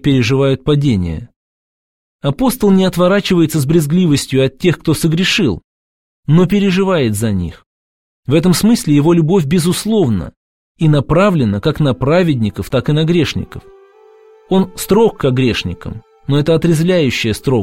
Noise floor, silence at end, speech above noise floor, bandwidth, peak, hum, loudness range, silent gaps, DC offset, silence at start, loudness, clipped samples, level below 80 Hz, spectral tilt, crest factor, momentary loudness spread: -44 dBFS; 0 s; 31 dB; 16.5 kHz; 0 dBFS; none; 3 LU; 1.36-2.19 s, 5.64-6.23 s, 7.66-8.23 s, 10.37-10.75 s; 0.8%; 0.05 s; -13 LUFS; under 0.1%; -38 dBFS; -6 dB/octave; 14 dB; 9 LU